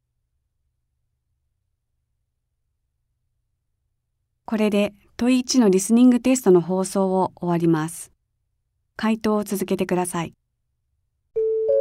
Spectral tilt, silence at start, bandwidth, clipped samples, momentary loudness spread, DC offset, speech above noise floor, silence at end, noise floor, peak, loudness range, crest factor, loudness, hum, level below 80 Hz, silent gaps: -5.5 dB/octave; 4.5 s; 16 kHz; under 0.1%; 11 LU; under 0.1%; 55 dB; 0 s; -75 dBFS; -6 dBFS; 9 LU; 18 dB; -21 LUFS; none; -60 dBFS; none